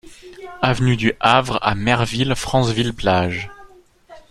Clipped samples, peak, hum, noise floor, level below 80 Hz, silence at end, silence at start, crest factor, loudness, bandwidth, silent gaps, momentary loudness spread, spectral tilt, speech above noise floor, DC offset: under 0.1%; 0 dBFS; none; -47 dBFS; -40 dBFS; 0.1 s; 0.05 s; 18 dB; -18 LUFS; 13 kHz; none; 12 LU; -5.5 dB/octave; 28 dB; under 0.1%